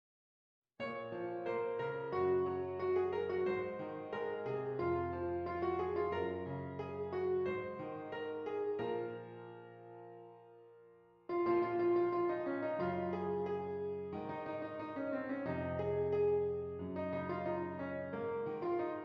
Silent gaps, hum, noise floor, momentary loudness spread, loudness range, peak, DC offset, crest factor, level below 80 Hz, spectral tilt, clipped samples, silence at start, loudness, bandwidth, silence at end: none; none; -63 dBFS; 10 LU; 4 LU; -22 dBFS; under 0.1%; 16 dB; -74 dBFS; -6.5 dB/octave; under 0.1%; 0.8 s; -39 LUFS; 5.4 kHz; 0 s